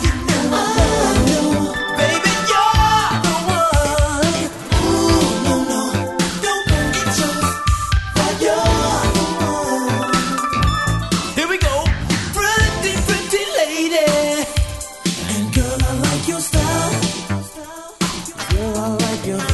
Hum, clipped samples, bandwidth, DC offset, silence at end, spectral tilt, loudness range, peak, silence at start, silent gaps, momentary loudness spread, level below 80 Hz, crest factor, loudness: none; under 0.1%; 12.5 kHz; under 0.1%; 0 s; -4 dB/octave; 4 LU; -2 dBFS; 0 s; none; 6 LU; -26 dBFS; 16 dB; -17 LUFS